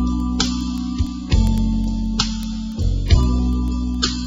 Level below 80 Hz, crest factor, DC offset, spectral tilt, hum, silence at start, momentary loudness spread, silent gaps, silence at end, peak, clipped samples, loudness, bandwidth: -22 dBFS; 18 dB; under 0.1%; -5 dB/octave; none; 0 s; 7 LU; none; 0 s; -2 dBFS; under 0.1%; -21 LUFS; 7.8 kHz